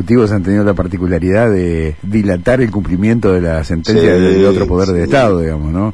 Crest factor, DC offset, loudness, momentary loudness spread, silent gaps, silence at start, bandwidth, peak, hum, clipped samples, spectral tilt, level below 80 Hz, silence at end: 12 dB; 2%; -12 LUFS; 7 LU; none; 0 s; 10.5 kHz; 0 dBFS; none; under 0.1%; -7.5 dB/octave; -28 dBFS; 0 s